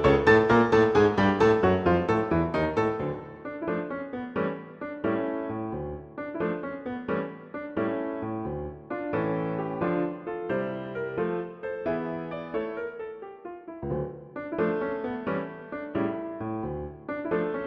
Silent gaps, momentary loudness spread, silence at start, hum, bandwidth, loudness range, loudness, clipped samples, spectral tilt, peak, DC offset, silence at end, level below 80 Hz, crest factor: none; 16 LU; 0 s; none; 7.8 kHz; 9 LU; -28 LUFS; under 0.1%; -7.5 dB/octave; -6 dBFS; under 0.1%; 0 s; -50 dBFS; 20 dB